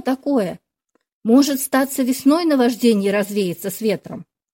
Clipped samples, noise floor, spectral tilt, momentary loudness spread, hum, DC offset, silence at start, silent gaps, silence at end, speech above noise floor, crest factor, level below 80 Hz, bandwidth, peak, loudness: under 0.1%; -69 dBFS; -5 dB/octave; 12 LU; none; under 0.1%; 0.05 s; 1.12-1.21 s; 0.3 s; 51 dB; 14 dB; -64 dBFS; 16.5 kHz; -4 dBFS; -18 LUFS